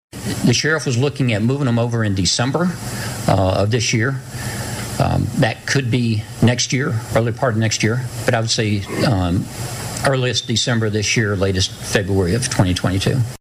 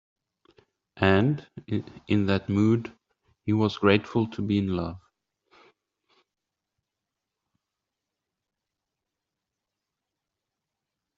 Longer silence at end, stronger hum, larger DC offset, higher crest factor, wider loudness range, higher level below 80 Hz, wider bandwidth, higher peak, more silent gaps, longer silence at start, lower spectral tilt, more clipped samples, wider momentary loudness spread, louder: second, 0.05 s vs 6.2 s; neither; neither; second, 12 dB vs 24 dB; second, 1 LU vs 9 LU; first, -42 dBFS vs -62 dBFS; first, 16 kHz vs 7.4 kHz; about the same, -6 dBFS vs -4 dBFS; neither; second, 0.15 s vs 0.95 s; second, -4.5 dB/octave vs -6 dB/octave; neither; second, 6 LU vs 12 LU; first, -18 LUFS vs -26 LUFS